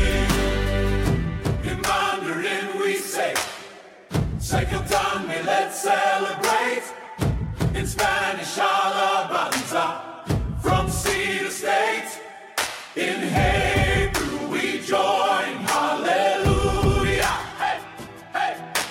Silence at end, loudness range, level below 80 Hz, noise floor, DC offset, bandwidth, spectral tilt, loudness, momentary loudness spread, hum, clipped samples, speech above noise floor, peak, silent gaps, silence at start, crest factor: 0 s; 3 LU; -32 dBFS; -43 dBFS; under 0.1%; 16.5 kHz; -4 dB/octave; -23 LUFS; 7 LU; none; under 0.1%; 21 dB; -6 dBFS; none; 0 s; 16 dB